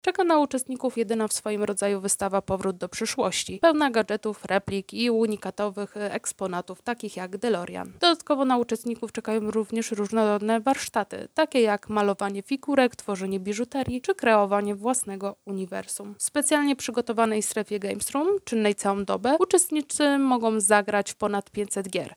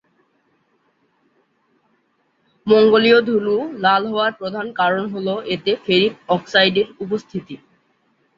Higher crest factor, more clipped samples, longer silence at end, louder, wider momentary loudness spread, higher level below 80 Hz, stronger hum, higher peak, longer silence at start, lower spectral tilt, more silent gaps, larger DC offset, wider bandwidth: about the same, 20 dB vs 18 dB; neither; second, 0.05 s vs 0.8 s; second, -25 LUFS vs -17 LUFS; second, 10 LU vs 14 LU; about the same, -60 dBFS vs -62 dBFS; neither; about the same, -4 dBFS vs -2 dBFS; second, 0.05 s vs 2.65 s; second, -3.5 dB/octave vs -6 dB/octave; neither; neither; first, over 20 kHz vs 7.2 kHz